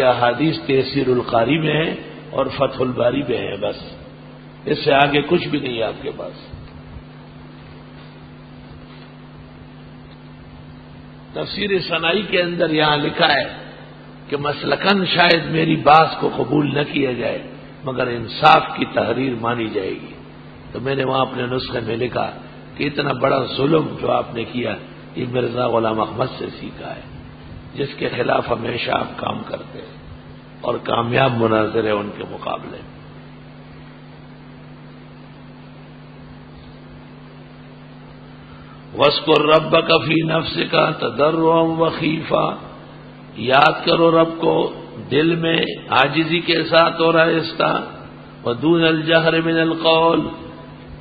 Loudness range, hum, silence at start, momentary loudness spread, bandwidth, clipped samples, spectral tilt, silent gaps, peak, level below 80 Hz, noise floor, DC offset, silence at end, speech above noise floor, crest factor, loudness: 23 LU; none; 0 s; 25 LU; 8 kHz; under 0.1%; -8 dB/octave; none; 0 dBFS; -48 dBFS; -39 dBFS; under 0.1%; 0 s; 21 dB; 20 dB; -18 LUFS